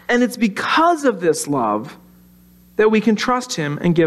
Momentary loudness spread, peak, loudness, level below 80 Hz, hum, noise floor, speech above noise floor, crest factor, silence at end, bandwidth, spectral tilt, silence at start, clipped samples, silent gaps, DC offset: 8 LU; -4 dBFS; -18 LUFS; -54 dBFS; none; -48 dBFS; 32 dB; 14 dB; 0 s; 14 kHz; -5 dB/octave; 0.1 s; under 0.1%; none; under 0.1%